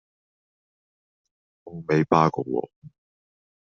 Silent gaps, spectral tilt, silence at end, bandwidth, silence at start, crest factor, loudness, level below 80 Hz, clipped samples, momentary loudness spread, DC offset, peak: 2.76-2.82 s; -6.5 dB/octave; 0.85 s; 6.8 kHz; 1.65 s; 24 dB; -23 LUFS; -64 dBFS; under 0.1%; 21 LU; under 0.1%; -4 dBFS